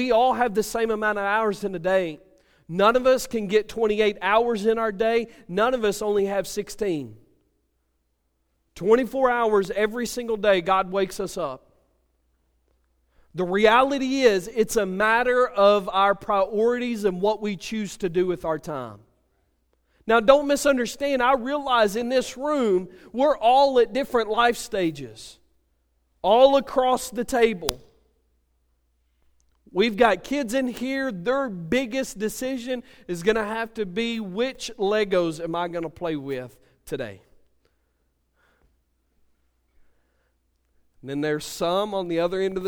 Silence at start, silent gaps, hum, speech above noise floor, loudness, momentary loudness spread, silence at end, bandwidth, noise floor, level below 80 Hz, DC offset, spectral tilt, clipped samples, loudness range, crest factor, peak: 0 s; none; none; 49 dB; -23 LUFS; 12 LU; 0 s; over 20 kHz; -72 dBFS; -52 dBFS; under 0.1%; -4.5 dB/octave; under 0.1%; 7 LU; 24 dB; 0 dBFS